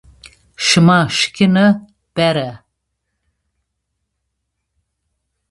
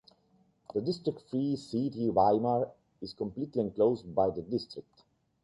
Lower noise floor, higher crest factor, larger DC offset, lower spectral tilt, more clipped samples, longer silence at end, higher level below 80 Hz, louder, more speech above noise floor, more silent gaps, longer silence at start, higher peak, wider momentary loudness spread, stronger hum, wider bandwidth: first, -74 dBFS vs -69 dBFS; about the same, 18 dB vs 20 dB; neither; second, -5 dB/octave vs -8.5 dB/octave; neither; first, 2.95 s vs 0.6 s; first, -52 dBFS vs -64 dBFS; first, -14 LUFS vs -31 LUFS; first, 61 dB vs 38 dB; neither; second, 0.6 s vs 0.75 s; first, 0 dBFS vs -12 dBFS; about the same, 11 LU vs 12 LU; neither; about the same, 11.5 kHz vs 11.5 kHz